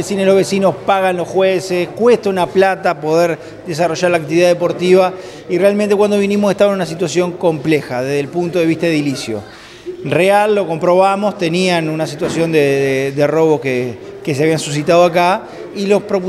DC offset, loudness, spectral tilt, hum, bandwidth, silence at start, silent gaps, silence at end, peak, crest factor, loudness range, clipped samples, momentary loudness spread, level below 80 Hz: under 0.1%; -14 LUFS; -5.5 dB/octave; none; 13.5 kHz; 0 s; none; 0 s; 0 dBFS; 14 dB; 2 LU; under 0.1%; 9 LU; -54 dBFS